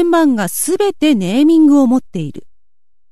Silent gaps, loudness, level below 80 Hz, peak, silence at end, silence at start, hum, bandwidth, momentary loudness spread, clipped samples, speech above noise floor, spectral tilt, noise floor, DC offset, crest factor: none; -12 LUFS; -54 dBFS; -2 dBFS; 0.7 s; 0 s; none; 13.5 kHz; 14 LU; under 0.1%; 55 dB; -5 dB/octave; -67 dBFS; 2%; 12 dB